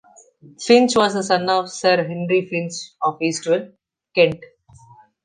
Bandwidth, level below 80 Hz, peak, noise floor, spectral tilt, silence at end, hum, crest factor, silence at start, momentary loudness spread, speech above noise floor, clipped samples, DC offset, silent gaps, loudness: 10 kHz; -62 dBFS; -2 dBFS; -49 dBFS; -4 dB/octave; 0.8 s; none; 18 dB; 0.6 s; 11 LU; 30 dB; under 0.1%; under 0.1%; none; -19 LUFS